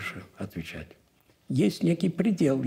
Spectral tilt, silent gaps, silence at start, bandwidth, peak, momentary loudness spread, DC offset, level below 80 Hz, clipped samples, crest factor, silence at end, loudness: -7 dB/octave; none; 0 s; 16 kHz; -12 dBFS; 15 LU; under 0.1%; -60 dBFS; under 0.1%; 16 dB; 0 s; -28 LUFS